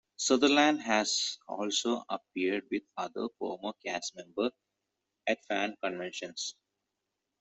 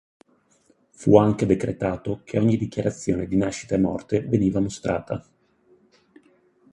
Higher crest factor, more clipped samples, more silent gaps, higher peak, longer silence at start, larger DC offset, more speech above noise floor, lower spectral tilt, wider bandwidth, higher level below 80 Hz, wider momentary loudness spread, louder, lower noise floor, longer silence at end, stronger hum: about the same, 22 dB vs 22 dB; neither; neither; second, -12 dBFS vs -2 dBFS; second, 0.2 s vs 1 s; neither; first, 54 dB vs 40 dB; second, -2 dB/octave vs -7.5 dB/octave; second, 8.2 kHz vs 11 kHz; second, -76 dBFS vs -48 dBFS; first, 13 LU vs 10 LU; second, -32 LUFS vs -23 LUFS; first, -86 dBFS vs -62 dBFS; second, 0.9 s vs 1.5 s; neither